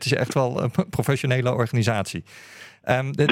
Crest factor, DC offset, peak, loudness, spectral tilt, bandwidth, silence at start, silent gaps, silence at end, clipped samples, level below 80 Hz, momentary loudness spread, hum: 20 dB; under 0.1%; -4 dBFS; -23 LUFS; -6 dB/octave; 16 kHz; 0 s; none; 0 s; under 0.1%; -56 dBFS; 14 LU; none